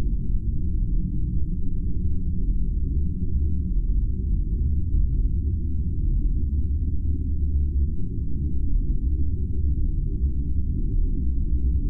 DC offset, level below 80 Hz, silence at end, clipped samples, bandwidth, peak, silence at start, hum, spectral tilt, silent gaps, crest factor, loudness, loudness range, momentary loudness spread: under 0.1%; -24 dBFS; 0 s; under 0.1%; 0.5 kHz; -10 dBFS; 0 s; none; -14.5 dB/octave; none; 10 dB; -27 LUFS; 1 LU; 3 LU